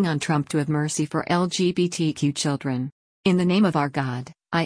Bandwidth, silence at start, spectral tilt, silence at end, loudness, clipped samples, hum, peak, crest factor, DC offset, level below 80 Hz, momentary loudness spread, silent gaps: 10.5 kHz; 0 s; -5.5 dB/octave; 0 s; -23 LUFS; under 0.1%; none; -8 dBFS; 16 dB; under 0.1%; -60 dBFS; 8 LU; 2.92-3.24 s